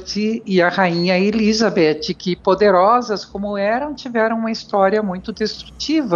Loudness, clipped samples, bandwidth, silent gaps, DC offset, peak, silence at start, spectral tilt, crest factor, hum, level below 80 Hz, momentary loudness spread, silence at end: -17 LUFS; under 0.1%; 7.4 kHz; none; under 0.1%; -4 dBFS; 0 s; -5.5 dB/octave; 14 dB; none; -48 dBFS; 10 LU; 0 s